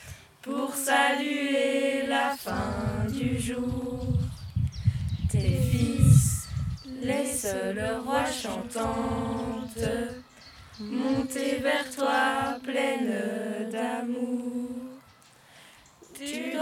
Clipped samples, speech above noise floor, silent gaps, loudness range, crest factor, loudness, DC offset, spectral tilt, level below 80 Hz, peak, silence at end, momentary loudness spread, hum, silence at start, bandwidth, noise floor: under 0.1%; 29 dB; none; 6 LU; 22 dB; -28 LUFS; under 0.1%; -5.5 dB/octave; -42 dBFS; -6 dBFS; 0 s; 11 LU; none; 0 s; 18 kHz; -56 dBFS